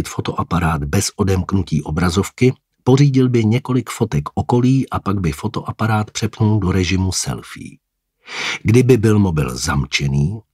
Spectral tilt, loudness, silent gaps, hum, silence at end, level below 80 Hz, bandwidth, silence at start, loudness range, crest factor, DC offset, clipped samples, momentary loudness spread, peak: -6 dB/octave; -17 LUFS; none; none; 0.15 s; -36 dBFS; 15.5 kHz; 0 s; 3 LU; 16 dB; under 0.1%; under 0.1%; 10 LU; 0 dBFS